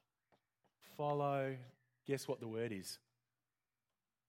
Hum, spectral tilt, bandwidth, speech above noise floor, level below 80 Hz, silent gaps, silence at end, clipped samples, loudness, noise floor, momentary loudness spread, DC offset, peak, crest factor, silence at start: none; -5.5 dB/octave; 16.5 kHz; over 49 dB; -88 dBFS; none; 1.3 s; under 0.1%; -42 LUFS; under -90 dBFS; 17 LU; under 0.1%; -26 dBFS; 20 dB; 0.85 s